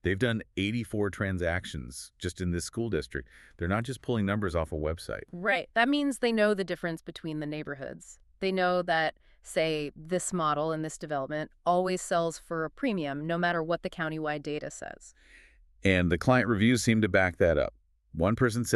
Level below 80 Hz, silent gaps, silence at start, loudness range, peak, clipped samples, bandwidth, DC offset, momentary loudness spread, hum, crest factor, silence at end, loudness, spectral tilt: -50 dBFS; none; 0.05 s; 6 LU; -8 dBFS; under 0.1%; 13.5 kHz; under 0.1%; 13 LU; none; 22 dB; 0 s; -29 LUFS; -5.5 dB/octave